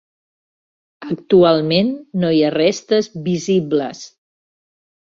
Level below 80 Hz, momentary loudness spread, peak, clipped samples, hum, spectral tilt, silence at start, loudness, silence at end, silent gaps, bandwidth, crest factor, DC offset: -58 dBFS; 15 LU; -2 dBFS; under 0.1%; none; -6 dB/octave; 1 s; -16 LUFS; 0.95 s; none; 7.8 kHz; 16 dB; under 0.1%